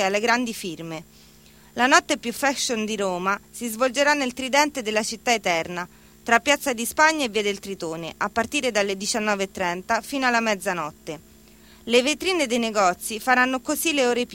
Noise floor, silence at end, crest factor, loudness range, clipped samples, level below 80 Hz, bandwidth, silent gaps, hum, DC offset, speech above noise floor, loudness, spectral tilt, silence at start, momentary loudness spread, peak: -50 dBFS; 0 s; 22 dB; 2 LU; under 0.1%; -58 dBFS; 17 kHz; none; none; under 0.1%; 27 dB; -22 LUFS; -2.5 dB/octave; 0 s; 13 LU; -2 dBFS